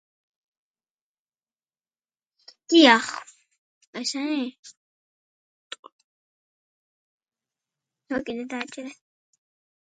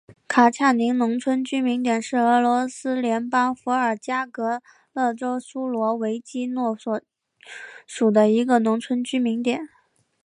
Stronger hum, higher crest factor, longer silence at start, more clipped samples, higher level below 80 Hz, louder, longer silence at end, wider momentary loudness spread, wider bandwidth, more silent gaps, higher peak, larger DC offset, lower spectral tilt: neither; first, 28 dB vs 18 dB; first, 2.7 s vs 0.1 s; neither; about the same, -74 dBFS vs -74 dBFS; about the same, -22 LUFS vs -22 LUFS; first, 0.9 s vs 0.6 s; first, 26 LU vs 12 LU; second, 9.4 kHz vs 10.5 kHz; first, 3.58-3.81 s, 3.87-3.93 s, 4.59-4.63 s, 4.77-5.70 s, 5.79-5.83 s, 5.92-7.20 s vs none; about the same, -2 dBFS vs -4 dBFS; neither; second, -2 dB/octave vs -5 dB/octave